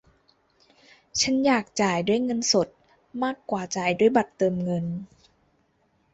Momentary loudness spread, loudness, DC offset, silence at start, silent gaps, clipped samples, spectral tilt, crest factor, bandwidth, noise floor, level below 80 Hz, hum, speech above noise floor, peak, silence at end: 10 LU; -24 LUFS; under 0.1%; 1.15 s; none; under 0.1%; -4 dB/octave; 20 dB; 8.2 kHz; -67 dBFS; -62 dBFS; none; 43 dB; -6 dBFS; 1.1 s